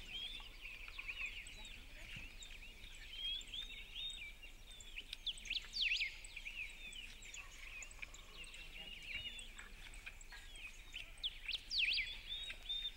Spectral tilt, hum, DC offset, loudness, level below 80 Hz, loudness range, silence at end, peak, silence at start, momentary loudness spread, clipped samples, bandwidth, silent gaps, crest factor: 0 dB/octave; none; under 0.1%; -45 LUFS; -56 dBFS; 8 LU; 0 s; -28 dBFS; 0 s; 16 LU; under 0.1%; 16 kHz; none; 20 dB